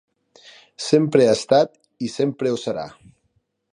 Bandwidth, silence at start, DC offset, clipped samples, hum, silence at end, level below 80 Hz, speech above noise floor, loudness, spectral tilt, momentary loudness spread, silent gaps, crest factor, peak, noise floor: 11 kHz; 0.8 s; under 0.1%; under 0.1%; none; 0.85 s; -64 dBFS; 49 dB; -20 LUFS; -5.5 dB/octave; 15 LU; none; 20 dB; -2 dBFS; -69 dBFS